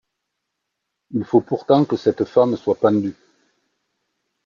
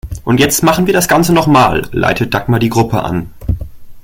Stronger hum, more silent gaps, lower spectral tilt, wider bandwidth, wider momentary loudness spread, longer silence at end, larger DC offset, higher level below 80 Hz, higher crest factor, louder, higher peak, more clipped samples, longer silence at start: neither; neither; first, -8.5 dB/octave vs -5 dB/octave; second, 7.2 kHz vs 17 kHz; about the same, 9 LU vs 11 LU; first, 1.35 s vs 0.05 s; neither; second, -64 dBFS vs -30 dBFS; first, 18 dB vs 12 dB; second, -19 LUFS vs -12 LUFS; second, -4 dBFS vs 0 dBFS; neither; first, 1.1 s vs 0.05 s